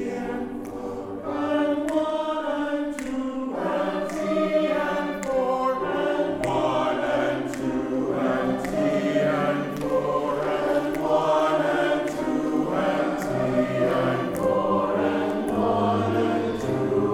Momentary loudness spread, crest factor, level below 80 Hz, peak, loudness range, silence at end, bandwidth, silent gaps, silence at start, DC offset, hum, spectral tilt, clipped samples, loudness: 6 LU; 14 dB; -52 dBFS; -10 dBFS; 3 LU; 0 s; 16 kHz; none; 0 s; under 0.1%; none; -6.5 dB/octave; under 0.1%; -25 LUFS